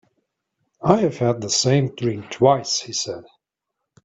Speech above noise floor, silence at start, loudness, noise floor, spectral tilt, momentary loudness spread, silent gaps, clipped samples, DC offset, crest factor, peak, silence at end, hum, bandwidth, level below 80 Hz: 61 dB; 0.8 s; -20 LUFS; -81 dBFS; -4.5 dB/octave; 8 LU; none; under 0.1%; under 0.1%; 22 dB; 0 dBFS; 0.85 s; none; 8.4 kHz; -58 dBFS